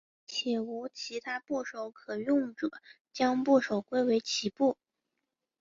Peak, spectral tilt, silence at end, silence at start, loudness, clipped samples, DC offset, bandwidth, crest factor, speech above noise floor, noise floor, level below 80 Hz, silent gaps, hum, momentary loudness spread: -14 dBFS; -4 dB/octave; 0.9 s; 0.3 s; -31 LUFS; under 0.1%; under 0.1%; 7.6 kHz; 18 dB; 55 dB; -86 dBFS; -76 dBFS; 3.01-3.05 s; none; 12 LU